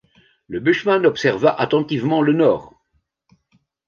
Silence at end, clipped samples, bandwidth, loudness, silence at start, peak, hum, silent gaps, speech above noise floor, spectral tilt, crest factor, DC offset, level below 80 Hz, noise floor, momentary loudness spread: 1.2 s; under 0.1%; 7 kHz; -18 LUFS; 0.5 s; -2 dBFS; none; none; 51 dB; -6.5 dB/octave; 16 dB; under 0.1%; -58 dBFS; -68 dBFS; 6 LU